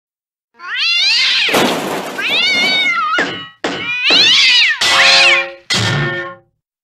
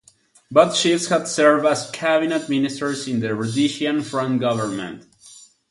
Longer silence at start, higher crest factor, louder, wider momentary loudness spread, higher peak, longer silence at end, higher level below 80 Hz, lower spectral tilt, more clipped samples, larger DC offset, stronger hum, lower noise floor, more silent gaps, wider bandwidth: about the same, 0.6 s vs 0.5 s; second, 14 dB vs 20 dB; first, -10 LUFS vs -20 LUFS; first, 14 LU vs 9 LU; about the same, 0 dBFS vs -2 dBFS; first, 0.5 s vs 0.35 s; first, -52 dBFS vs -64 dBFS; second, -2 dB/octave vs -4.5 dB/octave; neither; neither; neither; about the same, -47 dBFS vs -47 dBFS; neither; first, 15.5 kHz vs 11.5 kHz